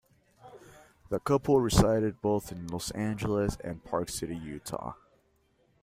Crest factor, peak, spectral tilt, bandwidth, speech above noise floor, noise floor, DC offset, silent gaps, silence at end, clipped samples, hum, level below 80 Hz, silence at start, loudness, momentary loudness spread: 24 dB; -8 dBFS; -6 dB/octave; 16 kHz; 40 dB; -69 dBFS; under 0.1%; none; 0.9 s; under 0.1%; none; -46 dBFS; 0.45 s; -30 LUFS; 14 LU